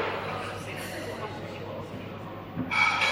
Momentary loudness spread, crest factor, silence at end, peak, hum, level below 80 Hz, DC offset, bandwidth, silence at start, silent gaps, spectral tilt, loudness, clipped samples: 15 LU; 20 dB; 0 s; -12 dBFS; none; -58 dBFS; under 0.1%; 16 kHz; 0 s; none; -4 dB/octave; -31 LUFS; under 0.1%